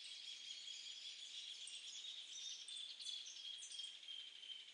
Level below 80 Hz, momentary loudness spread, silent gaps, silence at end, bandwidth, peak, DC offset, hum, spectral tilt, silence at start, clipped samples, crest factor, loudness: under -90 dBFS; 3 LU; none; 0 s; 11 kHz; -36 dBFS; under 0.1%; none; 4.5 dB/octave; 0 s; under 0.1%; 18 dB; -50 LUFS